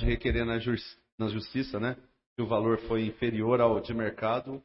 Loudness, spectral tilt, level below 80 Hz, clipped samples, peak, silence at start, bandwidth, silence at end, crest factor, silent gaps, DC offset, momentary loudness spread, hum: -30 LUFS; -10.5 dB/octave; -42 dBFS; under 0.1%; -10 dBFS; 0 s; 5.8 kHz; 0.05 s; 18 dB; 1.12-1.18 s, 2.26-2.36 s; under 0.1%; 10 LU; none